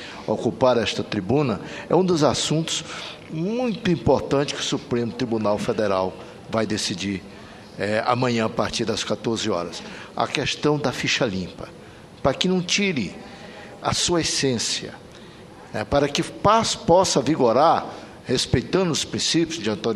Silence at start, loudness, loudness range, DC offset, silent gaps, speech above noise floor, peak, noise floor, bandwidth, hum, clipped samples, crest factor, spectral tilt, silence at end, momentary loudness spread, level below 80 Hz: 0 s; -22 LUFS; 5 LU; under 0.1%; none; 21 dB; 0 dBFS; -43 dBFS; 13.5 kHz; none; under 0.1%; 22 dB; -4 dB/octave; 0 s; 15 LU; -48 dBFS